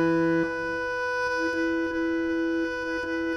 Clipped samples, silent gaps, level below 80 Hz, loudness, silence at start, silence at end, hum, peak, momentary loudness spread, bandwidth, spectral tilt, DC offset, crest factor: under 0.1%; none; -54 dBFS; -27 LUFS; 0 s; 0 s; none; -12 dBFS; 4 LU; 10 kHz; -6 dB/octave; under 0.1%; 14 dB